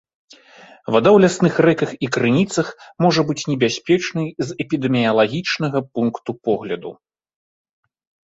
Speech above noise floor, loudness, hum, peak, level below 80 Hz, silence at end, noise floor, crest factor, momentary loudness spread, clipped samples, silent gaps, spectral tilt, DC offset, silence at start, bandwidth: 28 dB; -18 LUFS; none; -2 dBFS; -58 dBFS; 1.35 s; -46 dBFS; 18 dB; 12 LU; under 0.1%; none; -5.5 dB/octave; under 0.1%; 0.9 s; 8 kHz